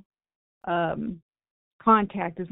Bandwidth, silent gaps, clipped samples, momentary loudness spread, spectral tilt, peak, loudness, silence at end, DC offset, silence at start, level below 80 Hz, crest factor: 4 kHz; 1.22-1.29 s, 1.51-1.79 s; under 0.1%; 17 LU; -5 dB/octave; -6 dBFS; -25 LUFS; 0.05 s; under 0.1%; 0.65 s; -58 dBFS; 22 dB